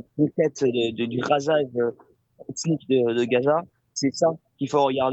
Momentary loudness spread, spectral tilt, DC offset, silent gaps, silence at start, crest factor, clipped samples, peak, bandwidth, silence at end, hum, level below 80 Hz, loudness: 8 LU; -5.5 dB/octave; under 0.1%; none; 0.15 s; 16 dB; under 0.1%; -8 dBFS; 8.2 kHz; 0 s; none; -68 dBFS; -24 LUFS